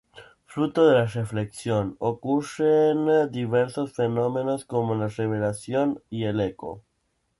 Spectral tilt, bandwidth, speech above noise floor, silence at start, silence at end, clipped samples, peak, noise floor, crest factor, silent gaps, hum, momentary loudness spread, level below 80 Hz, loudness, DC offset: -7 dB/octave; 11.5 kHz; 49 dB; 0.15 s; 0.6 s; under 0.1%; -6 dBFS; -73 dBFS; 18 dB; none; none; 10 LU; -58 dBFS; -24 LUFS; under 0.1%